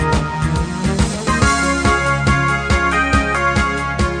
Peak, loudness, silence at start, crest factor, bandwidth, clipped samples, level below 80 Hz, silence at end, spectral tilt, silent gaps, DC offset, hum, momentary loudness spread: 0 dBFS; -16 LUFS; 0 s; 16 dB; 10 kHz; under 0.1%; -24 dBFS; 0 s; -5 dB/octave; none; 0.2%; none; 5 LU